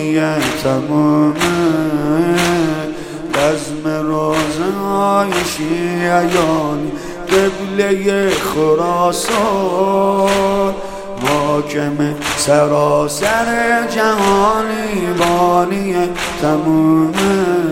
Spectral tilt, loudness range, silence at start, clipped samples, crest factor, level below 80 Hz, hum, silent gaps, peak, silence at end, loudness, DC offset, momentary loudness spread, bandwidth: -5 dB/octave; 2 LU; 0 s; under 0.1%; 14 dB; -40 dBFS; none; none; 0 dBFS; 0 s; -15 LUFS; under 0.1%; 6 LU; 16.5 kHz